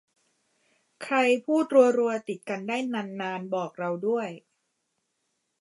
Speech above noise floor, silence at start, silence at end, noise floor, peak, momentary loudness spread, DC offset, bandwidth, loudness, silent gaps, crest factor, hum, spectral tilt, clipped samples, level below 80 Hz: 52 dB; 1 s; 1.2 s; -78 dBFS; -6 dBFS; 13 LU; under 0.1%; 11.5 kHz; -26 LUFS; none; 22 dB; none; -5.5 dB/octave; under 0.1%; -84 dBFS